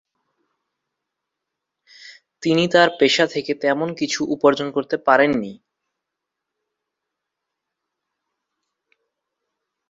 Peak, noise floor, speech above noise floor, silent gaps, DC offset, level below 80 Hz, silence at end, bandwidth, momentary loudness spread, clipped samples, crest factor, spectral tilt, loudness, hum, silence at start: -2 dBFS; -82 dBFS; 64 dB; none; under 0.1%; -64 dBFS; 4.35 s; 7.8 kHz; 8 LU; under 0.1%; 22 dB; -4.5 dB/octave; -19 LUFS; none; 2.05 s